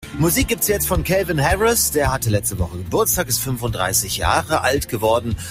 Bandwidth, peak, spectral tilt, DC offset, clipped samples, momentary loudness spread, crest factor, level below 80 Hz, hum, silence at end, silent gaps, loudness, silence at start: 16 kHz; -2 dBFS; -4 dB/octave; under 0.1%; under 0.1%; 5 LU; 18 dB; -32 dBFS; none; 0 s; none; -18 LUFS; 0 s